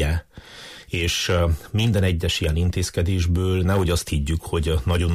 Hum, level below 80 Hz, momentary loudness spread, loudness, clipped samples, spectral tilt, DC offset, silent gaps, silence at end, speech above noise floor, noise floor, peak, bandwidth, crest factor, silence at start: none; -30 dBFS; 9 LU; -22 LUFS; under 0.1%; -5.5 dB/octave; under 0.1%; none; 0 s; 21 dB; -42 dBFS; -10 dBFS; 15.5 kHz; 12 dB; 0 s